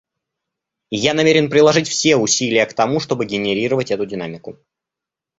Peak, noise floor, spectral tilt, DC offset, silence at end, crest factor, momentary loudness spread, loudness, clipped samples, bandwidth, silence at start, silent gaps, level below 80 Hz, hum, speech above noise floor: 0 dBFS; -86 dBFS; -3.5 dB/octave; under 0.1%; 0.85 s; 18 dB; 13 LU; -16 LUFS; under 0.1%; 8 kHz; 0.9 s; none; -56 dBFS; none; 69 dB